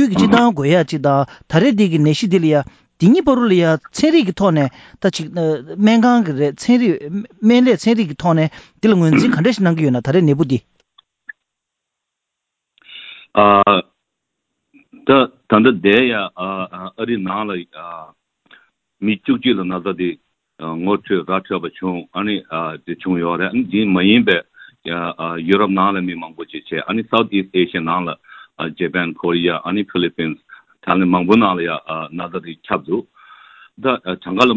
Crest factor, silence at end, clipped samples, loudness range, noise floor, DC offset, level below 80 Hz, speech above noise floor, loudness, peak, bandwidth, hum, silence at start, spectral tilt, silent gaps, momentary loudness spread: 16 dB; 0 s; under 0.1%; 7 LU; -79 dBFS; under 0.1%; -52 dBFS; 63 dB; -16 LUFS; 0 dBFS; 8 kHz; none; 0 s; -6.5 dB/octave; none; 13 LU